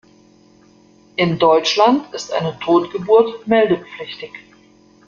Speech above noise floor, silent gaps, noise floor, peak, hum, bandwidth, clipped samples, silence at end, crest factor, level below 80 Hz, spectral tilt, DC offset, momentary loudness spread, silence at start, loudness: 34 dB; none; -50 dBFS; -2 dBFS; none; 7.4 kHz; under 0.1%; 0.7 s; 16 dB; -60 dBFS; -5 dB/octave; under 0.1%; 16 LU; 1.2 s; -16 LUFS